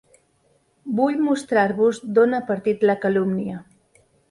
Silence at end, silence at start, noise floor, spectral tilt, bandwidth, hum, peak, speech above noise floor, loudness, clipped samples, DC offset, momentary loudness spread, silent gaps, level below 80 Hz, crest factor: 0.7 s; 0.85 s; -63 dBFS; -7 dB/octave; 11.5 kHz; none; -6 dBFS; 43 dB; -21 LUFS; under 0.1%; under 0.1%; 9 LU; none; -64 dBFS; 16 dB